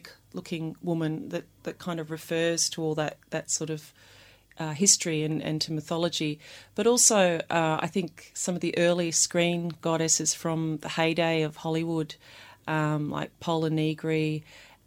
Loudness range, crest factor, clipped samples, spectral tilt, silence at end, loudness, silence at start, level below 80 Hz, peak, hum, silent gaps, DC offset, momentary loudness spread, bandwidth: 6 LU; 24 dB; under 0.1%; -3.5 dB/octave; 0.2 s; -27 LUFS; 0.05 s; -66 dBFS; -4 dBFS; none; none; under 0.1%; 14 LU; 16.5 kHz